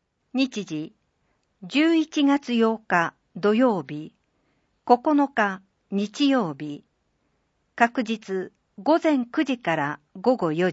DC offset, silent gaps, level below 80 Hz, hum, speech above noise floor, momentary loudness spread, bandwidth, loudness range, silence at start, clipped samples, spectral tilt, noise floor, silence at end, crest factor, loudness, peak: under 0.1%; none; -74 dBFS; none; 49 dB; 16 LU; 8 kHz; 3 LU; 0.35 s; under 0.1%; -5.5 dB/octave; -71 dBFS; 0 s; 22 dB; -24 LUFS; -2 dBFS